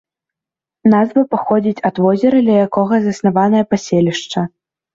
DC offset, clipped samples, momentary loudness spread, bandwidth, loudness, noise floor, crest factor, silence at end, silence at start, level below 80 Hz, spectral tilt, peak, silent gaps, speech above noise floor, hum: under 0.1%; under 0.1%; 6 LU; 7.6 kHz; -14 LUFS; -87 dBFS; 12 dB; 0.5 s; 0.85 s; -56 dBFS; -7 dB/octave; -2 dBFS; none; 73 dB; none